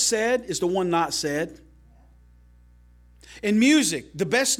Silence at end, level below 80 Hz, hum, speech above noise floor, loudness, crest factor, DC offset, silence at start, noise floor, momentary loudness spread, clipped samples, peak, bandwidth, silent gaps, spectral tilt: 0 s; -54 dBFS; 60 Hz at -50 dBFS; 30 dB; -23 LUFS; 16 dB; under 0.1%; 0 s; -53 dBFS; 11 LU; under 0.1%; -8 dBFS; 16.5 kHz; none; -3 dB/octave